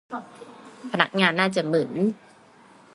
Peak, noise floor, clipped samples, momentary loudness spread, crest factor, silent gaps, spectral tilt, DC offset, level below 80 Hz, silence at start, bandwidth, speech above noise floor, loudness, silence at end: -2 dBFS; -52 dBFS; under 0.1%; 24 LU; 24 dB; none; -5.5 dB/octave; under 0.1%; -72 dBFS; 0.1 s; 11.5 kHz; 29 dB; -23 LUFS; 0.8 s